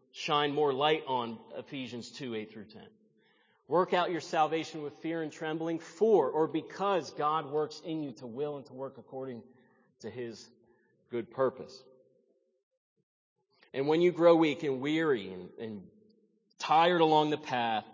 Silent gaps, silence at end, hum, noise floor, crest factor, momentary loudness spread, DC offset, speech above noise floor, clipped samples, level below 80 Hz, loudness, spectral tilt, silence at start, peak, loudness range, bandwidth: 12.63-12.71 s, 12.77-12.96 s, 13.03-13.36 s; 0 s; none; -72 dBFS; 22 dB; 18 LU; under 0.1%; 41 dB; under 0.1%; -82 dBFS; -31 LUFS; -5.5 dB/octave; 0.15 s; -12 dBFS; 10 LU; 7.6 kHz